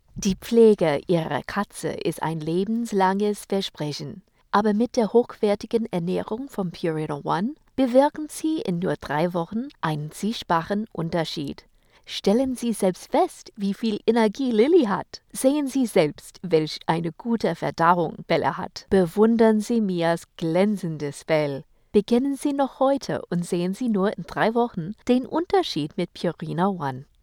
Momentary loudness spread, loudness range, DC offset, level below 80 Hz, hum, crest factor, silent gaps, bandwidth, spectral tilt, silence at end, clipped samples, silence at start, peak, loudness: 10 LU; 4 LU; under 0.1%; -56 dBFS; none; 20 dB; none; 17.5 kHz; -6 dB/octave; 0.2 s; under 0.1%; 0.15 s; -4 dBFS; -24 LUFS